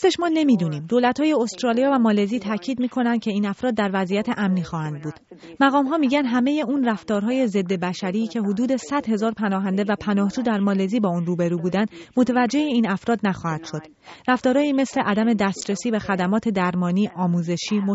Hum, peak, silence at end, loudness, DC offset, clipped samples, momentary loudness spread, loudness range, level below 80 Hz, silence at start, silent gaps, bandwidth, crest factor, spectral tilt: none; -6 dBFS; 0 s; -22 LUFS; under 0.1%; under 0.1%; 6 LU; 2 LU; -58 dBFS; 0 s; none; 8 kHz; 16 dB; -5.5 dB/octave